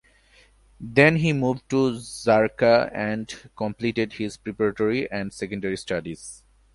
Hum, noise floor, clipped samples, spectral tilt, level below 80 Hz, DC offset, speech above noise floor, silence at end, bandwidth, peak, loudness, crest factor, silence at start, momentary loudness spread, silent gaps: none; -57 dBFS; under 0.1%; -6 dB/octave; -54 dBFS; under 0.1%; 33 dB; 0.4 s; 11.5 kHz; -2 dBFS; -23 LUFS; 22 dB; 0.8 s; 14 LU; none